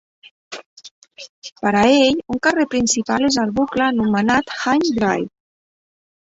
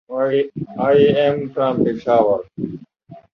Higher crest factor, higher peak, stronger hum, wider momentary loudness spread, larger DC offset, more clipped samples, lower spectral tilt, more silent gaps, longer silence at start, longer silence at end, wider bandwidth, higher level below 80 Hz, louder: about the same, 18 dB vs 16 dB; about the same, -2 dBFS vs -2 dBFS; neither; first, 21 LU vs 15 LU; neither; neither; second, -3.5 dB/octave vs -8.5 dB/octave; first, 0.66-0.77 s, 0.91-1.02 s, 1.29-1.42 s vs none; first, 0.5 s vs 0.1 s; first, 1.05 s vs 0.15 s; first, 8 kHz vs 6 kHz; about the same, -50 dBFS vs -54 dBFS; about the same, -17 LUFS vs -17 LUFS